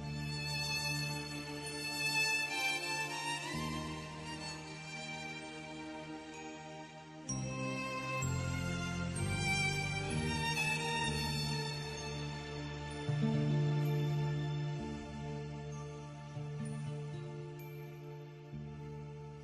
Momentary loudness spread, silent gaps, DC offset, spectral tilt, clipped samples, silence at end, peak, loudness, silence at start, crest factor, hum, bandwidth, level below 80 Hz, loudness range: 14 LU; none; under 0.1%; -4.5 dB/octave; under 0.1%; 0 s; -22 dBFS; -38 LUFS; 0 s; 16 dB; none; 13 kHz; -56 dBFS; 9 LU